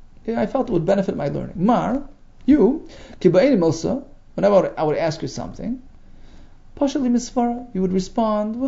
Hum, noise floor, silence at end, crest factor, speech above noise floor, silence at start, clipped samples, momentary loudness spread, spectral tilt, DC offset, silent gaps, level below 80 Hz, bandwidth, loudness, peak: none; -42 dBFS; 0 s; 18 dB; 22 dB; 0.25 s; under 0.1%; 13 LU; -7 dB/octave; under 0.1%; none; -42 dBFS; 7.8 kHz; -20 LUFS; -2 dBFS